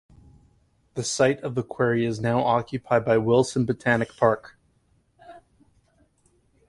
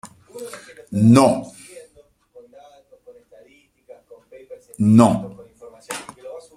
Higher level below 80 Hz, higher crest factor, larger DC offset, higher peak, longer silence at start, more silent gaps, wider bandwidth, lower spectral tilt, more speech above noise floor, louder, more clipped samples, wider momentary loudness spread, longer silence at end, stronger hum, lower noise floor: about the same, -58 dBFS vs -56 dBFS; about the same, 20 dB vs 22 dB; neither; second, -6 dBFS vs 0 dBFS; first, 0.95 s vs 0.05 s; neither; second, 11.5 kHz vs 14 kHz; second, -5.5 dB/octave vs -7 dB/octave; about the same, 42 dB vs 39 dB; second, -23 LUFS vs -16 LUFS; neither; second, 8 LU vs 27 LU; first, 1.3 s vs 0.15 s; neither; first, -65 dBFS vs -54 dBFS